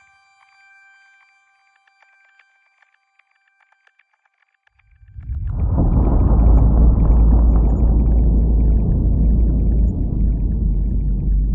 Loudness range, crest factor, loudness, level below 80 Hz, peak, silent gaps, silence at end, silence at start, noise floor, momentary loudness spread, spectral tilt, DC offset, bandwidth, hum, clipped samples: 9 LU; 14 dB; -18 LUFS; -18 dBFS; -4 dBFS; none; 0 s; 5.15 s; -65 dBFS; 7 LU; -13 dB/octave; under 0.1%; 2.5 kHz; none; under 0.1%